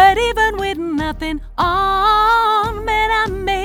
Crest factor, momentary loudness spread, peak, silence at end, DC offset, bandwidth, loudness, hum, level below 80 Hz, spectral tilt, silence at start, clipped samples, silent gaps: 16 dB; 9 LU; 0 dBFS; 0 s; under 0.1%; 19.5 kHz; -16 LUFS; none; -32 dBFS; -4.5 dB/octave; 0 s; under 0.1%; none